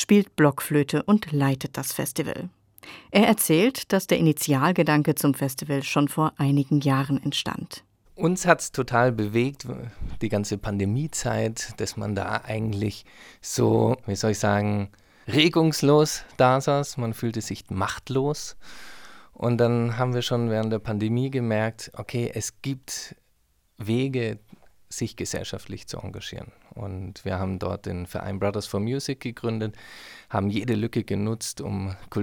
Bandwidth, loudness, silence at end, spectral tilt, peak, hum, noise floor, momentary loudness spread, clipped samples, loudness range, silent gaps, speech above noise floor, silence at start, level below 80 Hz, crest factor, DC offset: 19.5 kHz; -25 LUFS; 0 s; -5.5 dB/octave; -2 dBFS; none; -66 dBFS; 16 LU; under 0.1%; 9 LU; none; 41 dB; 0 s; -52 dBFS; 22 dB; under 0.1%